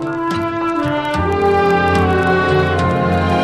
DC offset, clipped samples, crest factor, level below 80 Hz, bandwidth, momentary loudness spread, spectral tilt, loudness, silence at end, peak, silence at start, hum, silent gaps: under 0.1%; under 0.1%; 14 dB; -36 dBFS; 13 kHz; 5 LU; -7 dB/octave; -15 LUFS; 0 s; -2 dBFS; 0 s; none; none